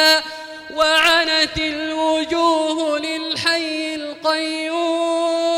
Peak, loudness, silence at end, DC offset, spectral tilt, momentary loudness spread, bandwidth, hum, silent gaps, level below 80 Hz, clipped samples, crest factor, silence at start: -4 dBFS; -18 LUFS; 0 s; under 0.1%; -2 dB/octave; 9 LU; 16 kHz; none; none; -48 dBFS; under 0.1%; 14 dB; 0 s